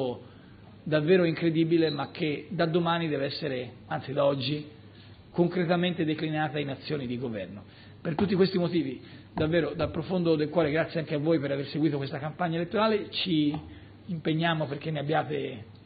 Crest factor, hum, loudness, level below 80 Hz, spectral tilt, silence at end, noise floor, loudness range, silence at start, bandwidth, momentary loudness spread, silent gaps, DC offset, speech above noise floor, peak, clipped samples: 18 dB; none; -28 LUFS; -60 dBFS; -5 dB/octave; 0.1 s; -50 dBFS; 3 LU; 0 s; 5 kHz; 11 LU; none; under 0.1%; 22 dB; -10 dBFS; under 0.1%